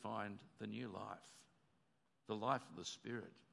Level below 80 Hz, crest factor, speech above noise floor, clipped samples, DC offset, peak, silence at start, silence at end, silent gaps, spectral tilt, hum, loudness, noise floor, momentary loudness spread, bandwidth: under -90 dBFS; 24 dB; 34 dB; under 0.1%; under 0.1%; -24 dBFS; 0 s; 0.1 s; none; -4.5 dB/octave; none; -47 LUFS; -82 dBFS; 18 LU; 11.5 kHz